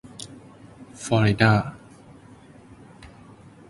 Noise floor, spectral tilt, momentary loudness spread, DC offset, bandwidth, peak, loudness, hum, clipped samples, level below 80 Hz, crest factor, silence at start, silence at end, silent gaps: -48 dBFS; -6 dB/octave; 28 LU; under 0.1%; 11.5 kHz; -2 dBFS; -21 LUFS; none; under 0.1%; -52 dBFS; 24 dB; 0.05 s; 0.6 s; none